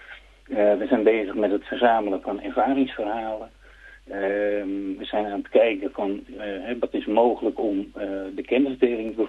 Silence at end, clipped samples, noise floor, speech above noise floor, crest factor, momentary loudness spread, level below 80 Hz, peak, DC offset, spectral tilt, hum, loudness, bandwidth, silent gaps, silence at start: 0 s; under 0.1%; -48 dBFS; 25 dB; 20 dB; 11 LU; -54 dBFS; -4 dBFS; under 0.1%; -7 dB/octave; none; -24 LUFS; 7.4 kHz; none; 0 s